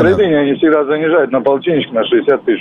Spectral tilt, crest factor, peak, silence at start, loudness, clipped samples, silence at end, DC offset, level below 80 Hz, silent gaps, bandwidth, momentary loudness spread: -8 dB/octave; 10 dB; -2 dBFS; 0 s; -13 LUFS; under 0.1%; 0 s; under 0.1%; -46 dBFS; none; 5.8 kHz; 3 LU